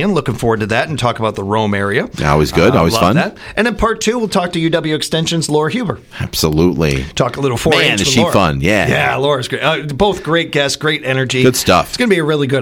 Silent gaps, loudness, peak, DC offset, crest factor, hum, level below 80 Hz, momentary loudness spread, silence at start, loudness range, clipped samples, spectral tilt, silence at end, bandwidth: none; -14 LUFS; 0 dBFS; under 0.1%; 14 dB; none; -34 dBFS; 5 LU; 0 s; 3 LU; under 0.1%; -4.5 dB/octave; 0 s; 18.5 kHz